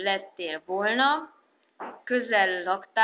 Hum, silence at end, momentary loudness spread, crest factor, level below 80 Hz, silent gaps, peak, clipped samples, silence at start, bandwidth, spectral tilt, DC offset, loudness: none; 0 s; 16 LU; 18 dB; -84 dBFS; none; -8 dBFS; under 0.1%; 0 s; 4 kHz; 0 dB/octave; under 0.1%; -26 LUFS